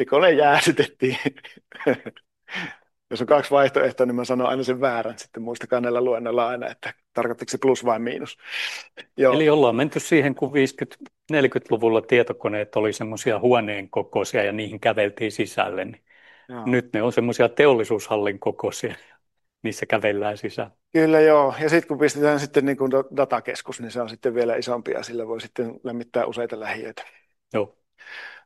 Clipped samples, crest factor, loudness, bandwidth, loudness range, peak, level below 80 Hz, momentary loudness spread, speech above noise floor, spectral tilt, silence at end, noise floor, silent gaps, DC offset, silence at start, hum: under 0.1%; 20 dB; -22 LUFS; 12.5 kHz; 6 LU; -2 dBFS; -68 dBFS; 15 LU; 45 dB; -5 dB/octave; 0.1 s; -67 dBFS; none; under 0.1%; 0 s; none